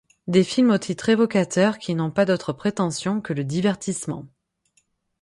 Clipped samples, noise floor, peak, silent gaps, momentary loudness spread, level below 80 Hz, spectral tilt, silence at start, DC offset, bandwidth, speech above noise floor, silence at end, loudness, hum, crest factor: under 0.1%; -67 dBFS; -4 dBFS; none; 8 LU; -60 dBFS; -5.5 dB/octave; 0.25 s; under 0.1%; 11.5 kHz; 46 dB; 0.95 s; -22 LUFS; none; 18 dB